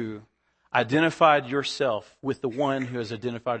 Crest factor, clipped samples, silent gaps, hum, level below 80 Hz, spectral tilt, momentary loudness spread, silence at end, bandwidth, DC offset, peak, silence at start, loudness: 20 dB; under 0.1%; none; none; -68 dBFS; -5.5 dB/octave; 12 LU; 0 s; 8.8 kHz; under 0.1%; -6 dBFS; 0 s; -25 LUFS